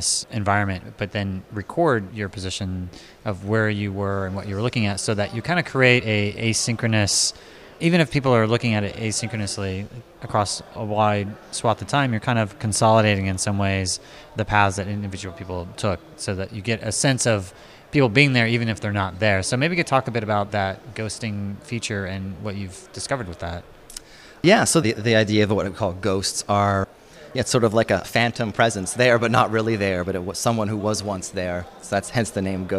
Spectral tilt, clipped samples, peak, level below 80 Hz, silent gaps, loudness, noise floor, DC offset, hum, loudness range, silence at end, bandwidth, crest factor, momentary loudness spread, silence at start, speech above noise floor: -4.5 dB/octave; under 0.1%; -2 dBFS; -50 dBFS; none; -22 LUFS; -42 dBFS; under 0.1%; none; 5 LU; 0 s; 15 kHz; 20 dB; 13 LU; 0 s; 20 dB